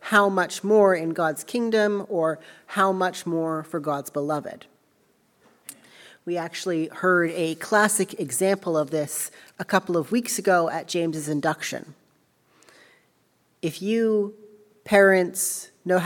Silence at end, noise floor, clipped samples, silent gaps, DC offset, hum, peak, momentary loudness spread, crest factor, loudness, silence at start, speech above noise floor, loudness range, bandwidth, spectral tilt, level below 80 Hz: 0 s; -66 dBFS; under 0.1%; none; under 0.1%; none; -4 dBFS; 13 LU; 20 dB; -24 LUFS; 0 s; 42 dB; 7 LU; 18 kHz; -4 dB/octave; -70 dBFS